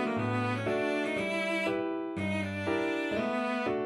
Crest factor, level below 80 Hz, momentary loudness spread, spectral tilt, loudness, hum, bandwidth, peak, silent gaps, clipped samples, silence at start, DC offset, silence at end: 14 dB; -64 dBFS; 3 LU; -6 dB/octave; -31 LUFS; none; 13.5 kHz; -18 dBFS; none; under 0.1%; 0 s; under 0.1%; 0 s